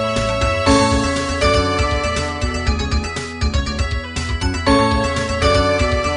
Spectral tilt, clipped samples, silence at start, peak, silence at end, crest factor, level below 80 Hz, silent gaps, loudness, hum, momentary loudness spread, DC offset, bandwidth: -5 dB/octave; under 0.1%; 0 s; 0 dBFS; 0 s; 16 dB; -24 dBFS; none; -18 LUFS; none; 7 LU; under 0.1%; 10.5 kHz